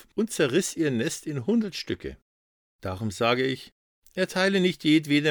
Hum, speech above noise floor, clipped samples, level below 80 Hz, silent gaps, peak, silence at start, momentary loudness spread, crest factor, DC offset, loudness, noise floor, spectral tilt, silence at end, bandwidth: none; over 65 dB; under 0.1%; -58 dBFS; 2.22-2.79 s, 3.72-4.02 s; -8 dBFS; 0.15 s; 14 LU; 18 dB; under 0.1%; -26 LUFS; under -90 dBFS; -4.5 dB/octave; 0 s; over 20 kHz